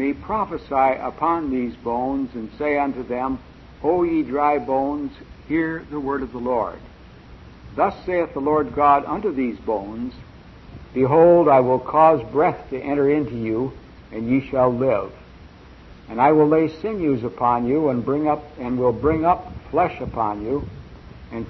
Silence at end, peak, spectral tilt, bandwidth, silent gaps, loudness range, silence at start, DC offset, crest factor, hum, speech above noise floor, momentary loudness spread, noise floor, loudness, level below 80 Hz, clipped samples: 0 s; -4 dBFS; -9.5 dB/octave; 6 kHz; none; 6 LU; 0 s; under 0.1%; 18 dB; none; 24 dB; 14 LU; -44 dBFS; -21 LUFS; -46 dBFS; under 0.1%